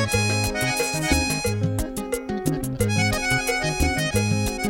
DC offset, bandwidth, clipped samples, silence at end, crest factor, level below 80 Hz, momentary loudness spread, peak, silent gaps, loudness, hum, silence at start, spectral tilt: under 0.1%; 17 kHz; under 0.1%; 0 s; 18 dB; -34 dBFS; 5 LU; -4 dBFS; none; -23 LUFS; none; 0 s; -4 dB/octave